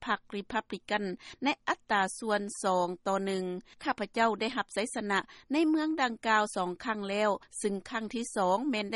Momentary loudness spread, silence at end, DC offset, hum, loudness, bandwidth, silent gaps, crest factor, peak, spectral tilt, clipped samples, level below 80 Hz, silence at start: 7 LU; 0 s; under 0.1%; none; -31 LUFS; 11.5 kHz; none; 18 dB; -14 dBFS; -4 dB/octave; under 0.1%; -68 dBFS; 0 s